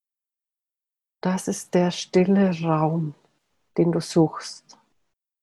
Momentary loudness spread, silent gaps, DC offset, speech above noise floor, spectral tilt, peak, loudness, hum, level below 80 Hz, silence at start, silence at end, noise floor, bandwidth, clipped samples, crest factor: 13 LU; none; under 0.1%; 67 dB; -6.5 dB/octave; -8 dBFS; -23 LUFS; none; -66 dBFS; 1.25 s; 0.85 s; -89 dBFS; 12.5 kHz; under 0.1%; 18 dB